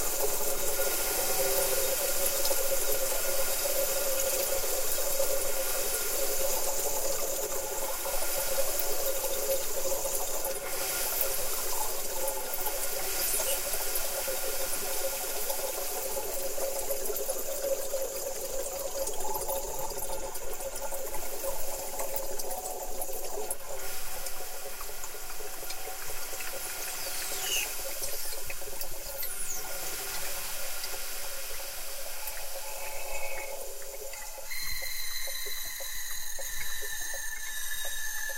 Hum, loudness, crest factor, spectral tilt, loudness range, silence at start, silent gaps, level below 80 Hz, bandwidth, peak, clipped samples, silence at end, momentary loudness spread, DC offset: none; -32 LUFS; 16 dB; -0.5 dB/octave; 8 LU; 0 s; none; -44 dBFS; 16.5 kHz; -14 dBFS; under 0.1%; 0 s; 9 LU; under 0.1%